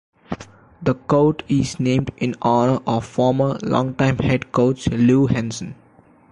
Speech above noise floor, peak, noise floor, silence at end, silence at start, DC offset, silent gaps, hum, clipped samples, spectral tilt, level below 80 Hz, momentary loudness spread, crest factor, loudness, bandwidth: 19 dB; -6 dBFS; -37 dBFS; 0.55 s; 0.3 s; under 0.1%; none; none; under 0.1%; -7 dB/octave; -44 dBFS; 13 LU; 14 dB; -19 LUFS; 11 kHz